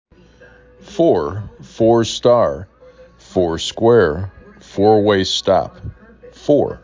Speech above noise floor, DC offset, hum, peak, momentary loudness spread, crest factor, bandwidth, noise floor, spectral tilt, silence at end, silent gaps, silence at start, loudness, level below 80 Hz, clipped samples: 31 dB; under 0.1%; none; -2 dBFS; 18 LU; 16 dB; 7.6 kHz; -46 dBFS; -5.5 dB/octave; 0.05 s; none; 0.85 s; -16 LUFS; -42 dBFS; under 0.1%